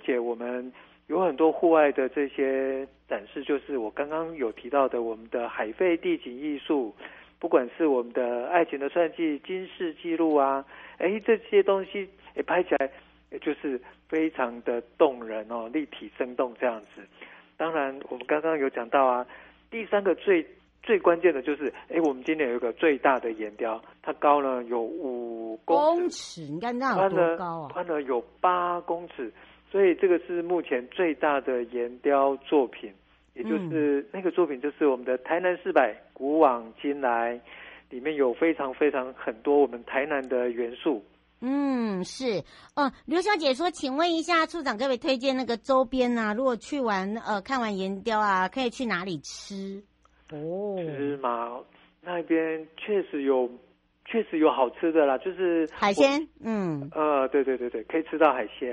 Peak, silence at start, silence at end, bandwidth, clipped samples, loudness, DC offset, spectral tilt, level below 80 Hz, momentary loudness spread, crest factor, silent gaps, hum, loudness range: -6 dBFS; 0.05 s; 0 s; 10.5 kHz; under 0.1%; -27 LUFS; under 0.1%; -5.5 dB/octave; -66 dBFS; 12 LU; 20 dB; none; none; 4 LU